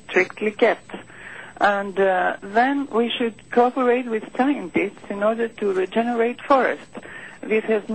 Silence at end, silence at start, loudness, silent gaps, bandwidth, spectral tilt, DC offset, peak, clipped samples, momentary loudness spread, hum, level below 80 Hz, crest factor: 0 s; 0.1 s; -21 LUFS; none; 8.6 kHz; -5.5 dB/octave; 0.3%; -6 dBFS; under 0.1%; 17 LU; none; -60 dBFS; 16 dB